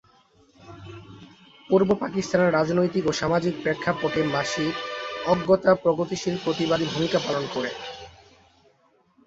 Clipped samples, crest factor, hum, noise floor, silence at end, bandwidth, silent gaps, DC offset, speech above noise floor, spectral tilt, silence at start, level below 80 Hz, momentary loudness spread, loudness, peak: under 0.1%; 20 dB; none; -63 dBFS; 1.15 s; 8 kHz; none; under 0.1%; 40 dB; -5.5 dB/octave; 0.6 s; -56 dBFS; 15 LU; -24 LUFS; -4 dBFS